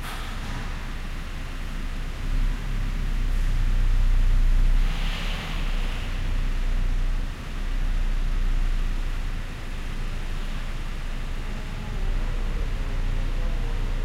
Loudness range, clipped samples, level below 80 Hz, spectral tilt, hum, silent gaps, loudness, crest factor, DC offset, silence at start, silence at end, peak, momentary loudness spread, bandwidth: 6 LU; under 0.1%; -24 dBFS; -5.5 dB/octave; none; none; -31 LUFS; 12 dB; under 0.1%; 0 s; 0 s; -12 dBFS; 9 LU; 8.8 kHz